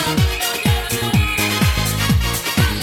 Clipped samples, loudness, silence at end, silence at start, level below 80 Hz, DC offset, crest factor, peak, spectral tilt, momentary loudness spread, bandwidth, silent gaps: under 0.1%; -17 LUFS; 0 s; 0 s; -26 dBFS; under 0.1%; 14 dB; -4 dBFS; -4 dB/octave; 2 LU; 18.5 kHz; none